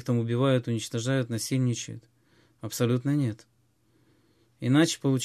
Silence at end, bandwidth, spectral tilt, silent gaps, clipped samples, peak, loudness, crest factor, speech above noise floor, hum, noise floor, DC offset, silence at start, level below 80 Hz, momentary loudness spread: 0 s; 14.5 kHz; -5.5 dB/octave; none; under 0.1%; -10 dBFS; -27 LUFS; 18 dB; 41 dB; none; -67 dBFS; under 0.1%; 0 s; -66 dBFS; 15 LU